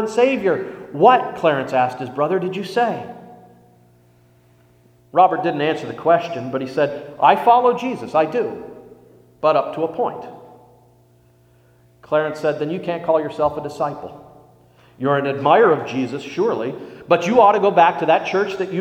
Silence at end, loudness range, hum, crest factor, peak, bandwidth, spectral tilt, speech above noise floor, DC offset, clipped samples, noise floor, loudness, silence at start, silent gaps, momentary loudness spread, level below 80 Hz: 0 s; 8 LU; 60 Hz at -55 dBFS; 20 dB; 0 dBFS; 14 kHz; -6 dB/octave; 36 dB; under 0.1%; under 0.1%; -54 dBFS; -18 LUFS; 0 s; none; 12 LU; -60 dBFS